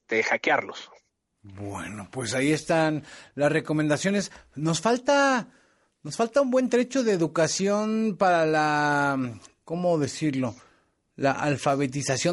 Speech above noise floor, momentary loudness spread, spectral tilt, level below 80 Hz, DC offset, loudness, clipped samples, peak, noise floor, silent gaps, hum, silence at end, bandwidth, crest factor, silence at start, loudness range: 39 dB; 14 LU; -5 dB/octave; -64 dBFS; under 0.1%; -25 LUFS; under 0.1%; -8 dBFS; -64 dBFS; none; none; 0 s; 11.5 kHz; 16 dB; 0.1 s; 4 LU